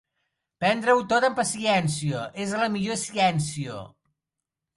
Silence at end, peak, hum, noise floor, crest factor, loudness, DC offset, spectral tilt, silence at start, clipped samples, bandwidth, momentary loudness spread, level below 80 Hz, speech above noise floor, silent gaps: 0.9 s; -8 dBFS; none; -86 dBFS; 18 dB; -24 LUFS; under 0.1%; -4.5 dB/octave; 0.6 s; under 0.1%; 11.5 kHz; 10 LU; -62 dBFS; 62 dB; none